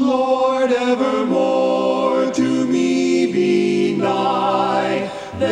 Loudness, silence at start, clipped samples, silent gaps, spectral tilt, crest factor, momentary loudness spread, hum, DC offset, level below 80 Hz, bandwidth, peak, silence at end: -17 LUFS; 0 s; under 0.1%; none; -5.5 dB/octave; 12 dB; 2 LU; none; under 0.1%; -58 dBFS; 10 kHz; -6 dBFS; 0 s